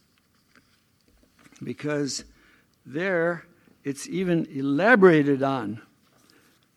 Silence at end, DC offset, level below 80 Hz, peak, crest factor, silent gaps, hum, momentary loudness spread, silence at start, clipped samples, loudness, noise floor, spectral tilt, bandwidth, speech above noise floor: 0.95 s; under 0.1%; -68 dBFS; -4 dBFS; 22 dB; none; none; 20 LU; 1.6 s; under 0.1%; -23 LUFS; -65 dBFS; -6 dB/octave; 13 kHz; 42 dB